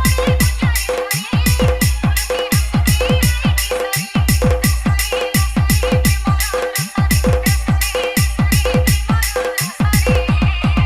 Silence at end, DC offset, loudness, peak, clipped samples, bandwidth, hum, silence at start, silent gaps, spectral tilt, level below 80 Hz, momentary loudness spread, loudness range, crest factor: 0 s; under 0.1%; -16 LUFS; -4 dBFS; under 0.1%; 16.5 kHz; none; 0 s; none; -4.5 dB/octave; -20 dBFS; 3 LU; 0 LU; 12 dB